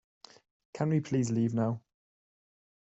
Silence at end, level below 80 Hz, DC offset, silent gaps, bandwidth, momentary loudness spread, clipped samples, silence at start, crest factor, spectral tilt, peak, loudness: 1.1 s; -70 dBFS; under 0.1%; none; 8.2 kHz; 10 LU; under 0.1%; 0.75 s; 16 dB; -7.5 dB/octave; -16 dBFS; -31 LUFS